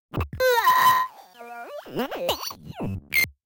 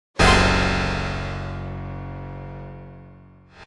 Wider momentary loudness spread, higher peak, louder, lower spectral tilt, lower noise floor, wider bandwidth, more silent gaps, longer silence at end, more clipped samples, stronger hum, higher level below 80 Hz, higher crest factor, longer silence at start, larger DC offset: about the same, 20 LU vs 22 LU; second, -8 dBFS vs -2 dBFS; about the same, -23 LUFS vs -21 LUFS; about the same, -3.5 dB/octave vs -4.5 dB/octave; second, -43 dBFS vs -47 dBFS; first, 17 kHz vs 11.5 kHz; neither; first, 0.15 s vs 0 s; neither; neither; second, -46 dBFS vs -32 dBFS; about the same, 18 dB vs 20 dB; about the same, 0.15 s vs 0.15 s; neither